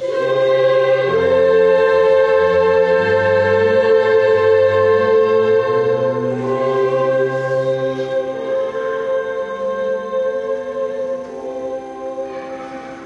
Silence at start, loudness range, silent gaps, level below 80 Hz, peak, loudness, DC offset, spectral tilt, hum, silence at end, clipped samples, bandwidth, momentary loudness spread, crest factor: 0 s; 9 LU; none; -48 dBFS; -4 dBFS; -16 LUFS; under 0.1%; -6.5 dB/octave; none; 0 s; under 0.1%; 7.8 kHz; 13 LU; 12 dB